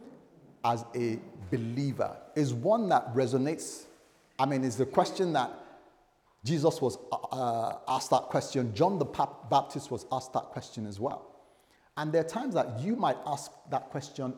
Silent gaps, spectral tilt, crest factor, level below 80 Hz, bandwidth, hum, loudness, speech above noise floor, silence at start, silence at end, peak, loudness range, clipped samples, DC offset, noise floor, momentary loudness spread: none; -6 dB/octave; 22 dB; -72 dBFS; 17.5 kHz; none; -31 LUFS; 36 dB; 0 s; 0 s; -10 dBFS; 4 LU; under 0.1%; under 0.1%; -66 dBFS; 10 LU